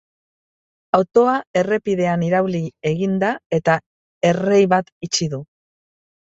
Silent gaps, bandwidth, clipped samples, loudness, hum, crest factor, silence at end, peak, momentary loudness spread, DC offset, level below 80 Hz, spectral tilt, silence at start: 1.47-1.54 s, 3.46-3.50 s, 3.86-4.21 s, 4.92-5.01 s; 8 kHz; under 0.1%; -19 LUFS; none; 18 dB; 0.85 s; -2 dBFS; 7 LU; under 0.1%; -58 dBFS; -5.5 dB/octave; 0.95 s